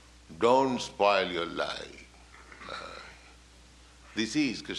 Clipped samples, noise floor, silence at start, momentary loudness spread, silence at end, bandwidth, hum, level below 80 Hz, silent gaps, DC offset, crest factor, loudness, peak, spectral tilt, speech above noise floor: under 0.1%; -55 dBFS; 0.3 s; 22 LU; 0 s; 12 kHz; 60 Hz at -60 dBFS; -58 dBFS; none; under 0.1%; 20 dB; -29 LUFS; -10 dBFS; -4 dB/octave; 27 dB